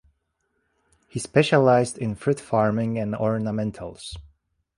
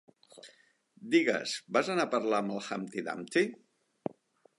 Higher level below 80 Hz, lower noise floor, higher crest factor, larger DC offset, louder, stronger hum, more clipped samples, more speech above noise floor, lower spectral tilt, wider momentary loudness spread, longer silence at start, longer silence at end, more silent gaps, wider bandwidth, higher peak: first, -54 dBFS vs -84 dBFS; first, -74 dBFS vs -65 dBFS; about the same, 20 dB vs 22 dB; neither; first, -23 LUFS vs -32 LUFS; neither; neither; first, 51 dB vs 34 dB; first, -6 dB/octave vs -4.5 dB/octave; first, 18 LU vs 15 LU; first, 1.15 s vs 0.35 s; second, 0.5 s vs 1.05 s; neither; about the same, 11.5 kHz vs 11.5 kHz; first, -4 dBFS vs -12 dBFS